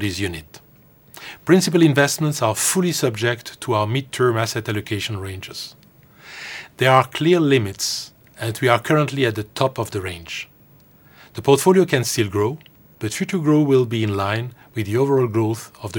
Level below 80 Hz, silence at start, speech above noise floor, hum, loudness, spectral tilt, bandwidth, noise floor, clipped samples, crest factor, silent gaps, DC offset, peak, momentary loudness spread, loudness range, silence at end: -56 dBFS; 0 s; 32 dB; none; -19 LUFS; -5 dB/octave; 19 kHz; -51 dBFS; under 0.1%; 20 dB; none; under 0.1%; 0 dBFS; 16 LU; 4 LU; 0 s